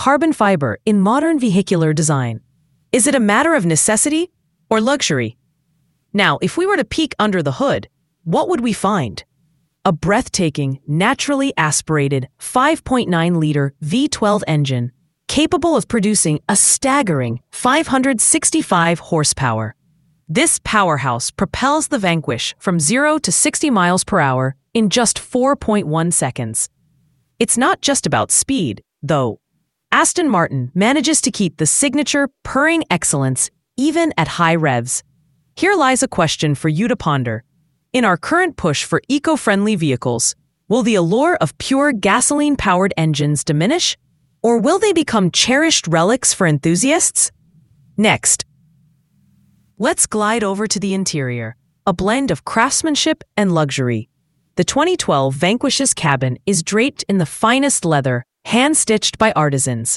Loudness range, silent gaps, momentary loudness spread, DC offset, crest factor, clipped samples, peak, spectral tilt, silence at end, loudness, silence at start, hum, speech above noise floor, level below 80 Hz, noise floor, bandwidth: 3 LU; none; 7 LU; under 0.1%; 16 dB; under 0.1%; 0 dBFS; -4 dB/octave; 0 s; -16 LUFS; 0 s; none; 54 dB; -46 dBFS; -69 dBFS; 12 kHz